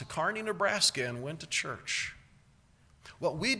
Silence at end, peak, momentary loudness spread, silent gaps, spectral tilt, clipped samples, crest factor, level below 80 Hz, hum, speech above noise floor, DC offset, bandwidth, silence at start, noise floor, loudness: 0 s; -14 dBFS; 10 LU; none; -2.5 dB/octave; under 0.1%; 20 dB; -62 dBFS; none; 31 dB; under 0.1%; 11 kHz; 0 s; -63 dBFS; -31 LUFS